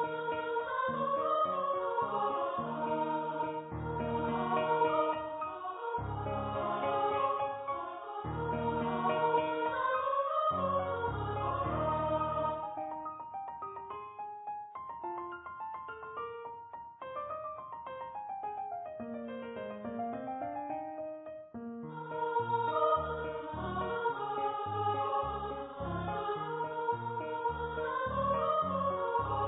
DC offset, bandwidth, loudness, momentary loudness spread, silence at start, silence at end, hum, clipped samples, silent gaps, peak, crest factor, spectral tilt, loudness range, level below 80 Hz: under 0.1%; 3.9 kHz; -35 LUFS; 12 LU; 0 s; 0 s; none; under 0.1%; none; -18 dBFS; 18 dB; -2.5 dB/octave; 10 LU; -56 dBFS